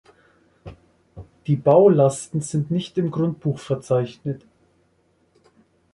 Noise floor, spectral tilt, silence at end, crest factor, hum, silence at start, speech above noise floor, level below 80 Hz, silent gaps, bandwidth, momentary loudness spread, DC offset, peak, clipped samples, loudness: -63 dBFS; -7.5 dB/octave; 1.55 s; 20 dB; none; 0.65 s; 44 dB; -56 dBFS; none; 11.5 kHz; 16 LU; under 0.1%; -4 dBFS; under 0.1%; -21 LUFS